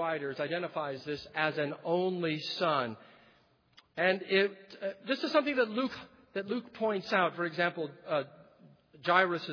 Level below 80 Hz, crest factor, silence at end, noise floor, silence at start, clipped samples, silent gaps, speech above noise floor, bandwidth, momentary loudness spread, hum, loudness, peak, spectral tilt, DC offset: -76 dBFS; 22 dB; 0 s; -66 dBFS; 0 s; under 0.1%; none; 34 dB; 5.4 kHz; 12 LU; none; -32 LUFS; -10 dBFS; -6 dB/octave; under 0.1%